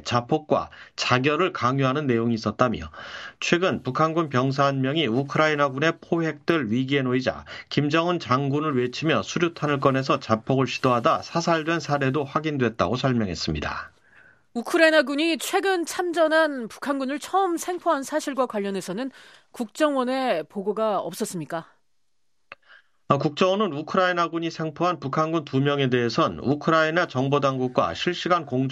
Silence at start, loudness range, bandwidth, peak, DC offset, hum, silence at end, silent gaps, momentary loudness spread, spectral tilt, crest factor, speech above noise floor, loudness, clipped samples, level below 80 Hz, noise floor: 0 s; 4 LU; 14.5 kHz; -2 dBFS; under 0.1%; none; 0 s; none; 8 LU; -5.5 dB/octave; 22 dB; 55 dB; -24 LUFS; under 0.1%; -56 dBFS; -78 dBFS